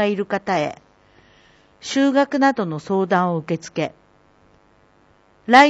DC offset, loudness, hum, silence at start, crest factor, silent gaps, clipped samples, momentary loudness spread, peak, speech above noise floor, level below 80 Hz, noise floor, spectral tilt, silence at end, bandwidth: under 0.1%; -20 LUFS; none; 0 s; 20 dB; none; under 0.1%; 11 LU; 0 dBFS; 36 dB; -64 dBFS; -56 dBFS; -5 dB/octave; 0 s; 10 kHz